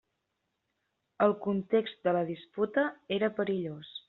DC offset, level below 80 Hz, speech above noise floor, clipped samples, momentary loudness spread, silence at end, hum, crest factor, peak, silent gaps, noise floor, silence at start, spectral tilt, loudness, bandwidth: under 0.1%; -72 dBFS; 52 dB; under 0.1%; 6 LU; 0.1 s; none; 20 dB; -12 dBFS; none; -82 dBFS; 1.2 s; -4.5 dB/octave; -31 LUFS; 4.2 kHz